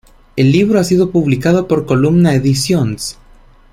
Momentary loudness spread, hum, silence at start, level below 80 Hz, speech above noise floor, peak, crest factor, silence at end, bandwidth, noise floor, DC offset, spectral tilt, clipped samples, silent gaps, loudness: 8 LU; none; 0.35 s; -40 dBFS; 31 dB; -2 dBFS; 12 dB; 0.6 s; 15.5 kHz; -43 dBFS; under 0.1%; -6.5 dB/octave; under 0.1%; none; -13 LUFS